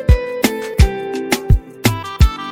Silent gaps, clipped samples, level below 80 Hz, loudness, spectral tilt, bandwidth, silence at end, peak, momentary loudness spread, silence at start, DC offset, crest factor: none; 0.1%; -18 dBFS; -17 LUFS; -5.5 dB/octave; 19.5 kHz; 0 s; 0 dBFS; 4 LU; 0 s; under 0.1%; 14 dB